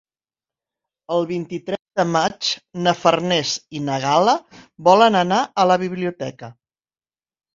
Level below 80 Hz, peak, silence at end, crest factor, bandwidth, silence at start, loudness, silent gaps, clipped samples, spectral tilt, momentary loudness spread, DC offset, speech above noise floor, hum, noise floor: -62 dBFS; 0 dBFS; 1.05 s; 20 dB; 7.6 kHz; 1.1 s; -19 LUFS; none; under 0.1%; -4.5 dB/octave; 12 LU; under 0.1%; over 71 dB; none; under -90 dBFS